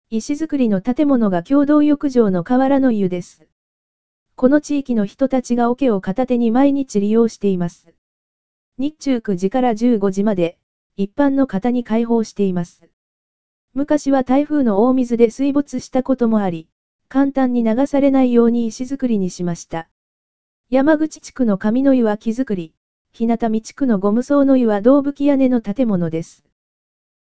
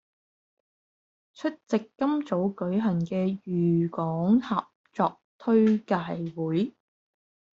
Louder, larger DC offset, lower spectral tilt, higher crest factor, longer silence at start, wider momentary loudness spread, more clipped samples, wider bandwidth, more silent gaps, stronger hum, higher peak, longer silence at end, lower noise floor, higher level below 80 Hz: first, -17 LUFS vs -27 LUFS; first, 2% vs under 0.1%; about the same, -7 dB/octave vs -7.5 dB/octave; about the same, 16 dB vs 18 dB; second, 0.05 s vs 1.4 s; about the same, 9 LU vs 10 LU; neither; about the same, 8 kHz vs 7.4 kHz; first, 3.52-4.26 s, 7.98-8.72 s, 10.63-10.90 s, 12.93-13.68 s, 16.72-16.99 s, 19.91-20.64 s, 22.77-23.05 s vs 4.75-4.84 s, 5.24-5.39 s; neither; first, 0 dBFS vs -10 dBFS; about the same, 0.7 s vs 0.8 s; about the same, under -90 dBFS vs under -90 dBFS; first, -50 dBFS vs -68 dBFS